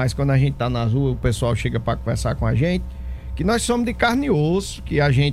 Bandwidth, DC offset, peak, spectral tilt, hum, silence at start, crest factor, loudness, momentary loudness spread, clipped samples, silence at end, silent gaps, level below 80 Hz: 13.5 kHz; under 0.1%; -4 dBFS; -6 dB/octave; none; 0 s; 14 dB; -21 LUFS; 6 LU; under 0.1%; 0 s; none; -32 dBFS